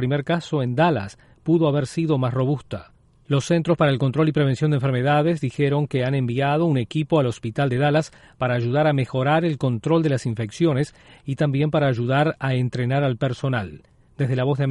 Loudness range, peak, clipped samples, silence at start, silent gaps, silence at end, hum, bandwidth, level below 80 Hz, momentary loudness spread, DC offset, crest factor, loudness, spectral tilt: 2 LU; -6 dBFS; under 0.1%; 0 s; none; 0 s; none; 11 kHz; -54 dBFS; 8 LU; under 0.1%; 14 dB; -22 LUFS; -7.5 dB/octave